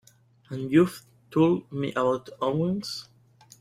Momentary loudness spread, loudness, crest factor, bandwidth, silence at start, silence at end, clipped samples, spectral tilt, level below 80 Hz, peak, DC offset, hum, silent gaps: 14 LU; -26 LUFS; 20 dB; 15 kHz; 0.5 s; 0.55 s; under 0.1%; -7 dB/octave; -64 dBFS; -8 dBFS; under 0.1%; none; none